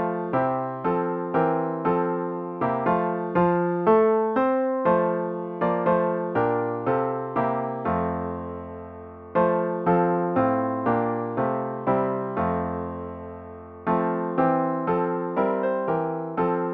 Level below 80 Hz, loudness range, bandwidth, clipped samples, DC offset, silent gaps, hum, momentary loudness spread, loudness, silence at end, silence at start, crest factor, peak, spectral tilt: -56 dBFS; 4 LU; 4.6 kHz; under 0.1%; under 0.1%; none; none; 9 LU; -24 LUFS; 0 s; 0 s; 16 dB; -8 dBFS; -11 dB/octave